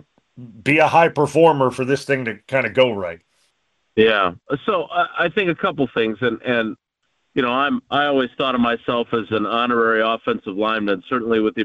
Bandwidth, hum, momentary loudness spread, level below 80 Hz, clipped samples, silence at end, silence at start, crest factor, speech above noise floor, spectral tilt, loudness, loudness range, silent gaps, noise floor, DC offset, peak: 12 kHz; none; 8 LU; -56 dBFS; under 0.1%; 0 s; 0.35 s; 16 dB; 52 dB; -6 dB/octave; -19 LUFS; 3 LU; none; -71 dBFS; under 0.1%; -2 dBFS